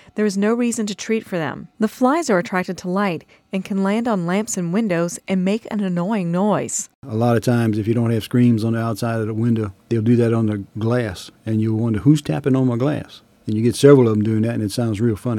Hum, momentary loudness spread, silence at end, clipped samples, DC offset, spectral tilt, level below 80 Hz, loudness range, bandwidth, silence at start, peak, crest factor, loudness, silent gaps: none; 8 LU; 0 s; under 0.1%; under 0.1%; -6.5 dB/octave; -56 dBFS; 4 LU; 16 kHz; 0.15 s; 0 dBFS; 18 dB; -19 LUFS; 6.95-7.02 s